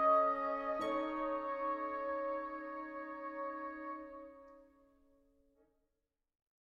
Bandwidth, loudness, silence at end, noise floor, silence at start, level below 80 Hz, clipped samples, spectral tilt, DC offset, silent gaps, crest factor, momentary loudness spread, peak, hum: 9.6 kHz; -39 LUFS; 2.05 s; -87 dBFS; 0 s; -70 dBFS; under 0.1%; -5.5 dB/octave; under 0.1%; none; 20 dB; 13 LU; -20 dBFS; none